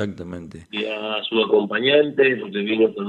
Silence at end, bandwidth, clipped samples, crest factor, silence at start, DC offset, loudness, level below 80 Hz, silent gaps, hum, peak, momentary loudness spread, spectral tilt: 0 s; 7.2 kHz; under 0.1%; 16 dB; 0 s; under 0.1%; -20 LUFS; -60 dBFS; none; none; -4 dBFS; 15 LU; -6.5 dB/octave